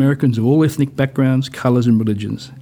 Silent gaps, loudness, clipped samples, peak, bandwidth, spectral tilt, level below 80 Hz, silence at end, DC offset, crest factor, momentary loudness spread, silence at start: none; -16 LUFS; under 0.1%; -2 dBFS; 20 kHz; -8 dB/octave; -56 dBFS; 0 s; under 0.1%; 14 dB; 6 LU; 0 s